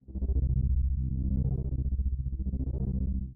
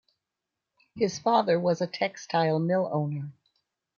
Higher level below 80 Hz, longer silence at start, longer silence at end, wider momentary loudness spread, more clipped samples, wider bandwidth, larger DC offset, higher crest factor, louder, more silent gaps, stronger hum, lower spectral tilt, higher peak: first, -30 dBFS vs -72 dBFS; second, 0.1 s vs 0.95 s; second, 0 s vs 0.65 s; second, 5 LU vs 9 LU; neither; second, 1 kHz vs 7.2 kHz; neither; second, 10 dB vs 18 dB; second, -32 LUFS vs -27 LUFS; neither; neither; first, -18.5 dB/octave vs -6 dB/octave; second, -18 dBFS vs -10 dBFS